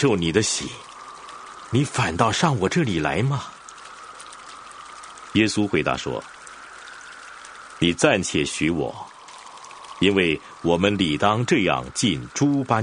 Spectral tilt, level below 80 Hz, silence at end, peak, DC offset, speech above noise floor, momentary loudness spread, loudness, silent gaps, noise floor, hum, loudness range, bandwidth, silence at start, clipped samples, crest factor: -4.5 dB/octave; -50 dBFS; 0 s; 0 dBFS; under 0.1%; 21 dB; 20 LU; -22 LUFS; none; -42 dBFS; none; 5 LU; 10.5 kHz; 0 s; under 0.1%; 22 dB